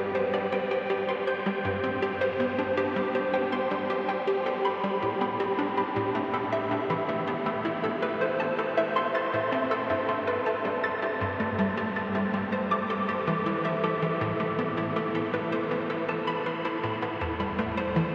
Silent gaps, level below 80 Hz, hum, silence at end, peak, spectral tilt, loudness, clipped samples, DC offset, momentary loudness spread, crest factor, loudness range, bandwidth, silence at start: none; -56 dBFS; none; 0 s; -12 dBFS; -8 dB/octave; -28 LUFS; under 0.1%; under 0.1%; 2 LU; 16 dB; 1 LU; 7.2 kHz; 0 s